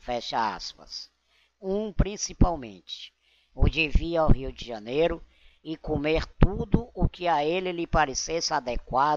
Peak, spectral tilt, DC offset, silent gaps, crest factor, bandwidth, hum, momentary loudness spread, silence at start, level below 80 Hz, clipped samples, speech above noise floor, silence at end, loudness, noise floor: -6 dBFS; -5 dB/octave; under 0.1%; none; 20 dB; 7.6 kHz; none; 14 LU; 0.05 s; -32 dBFS; under 0.1%; 41 dB; 0 s; -27 LUFS; -67 dBFS